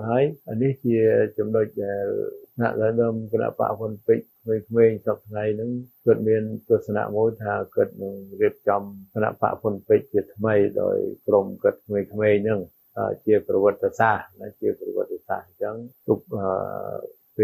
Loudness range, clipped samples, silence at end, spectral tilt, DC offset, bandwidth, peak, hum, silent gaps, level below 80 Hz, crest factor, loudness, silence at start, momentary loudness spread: 2 LU; under 0.1%; 0 s; -9.5 dB/octave; under 0.1%; 15.5 kHz; -6 dBFS; none; none; -64 dBFS; 18 dB; -24 LUFS; 0 s; 11 LU